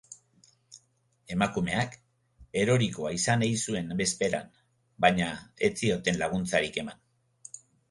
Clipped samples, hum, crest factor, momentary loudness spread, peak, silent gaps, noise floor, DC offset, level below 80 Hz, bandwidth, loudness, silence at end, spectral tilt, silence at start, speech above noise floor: under 0.1%; none; 24 dB; 18 LU; -6 dBFS; none; -69 dBFS; under 0.1%; -56 dBFS; 11.5 kHz; -28 LUFS; 0.35 s; -4.5 dB/octave; 0.1 s; 41 dB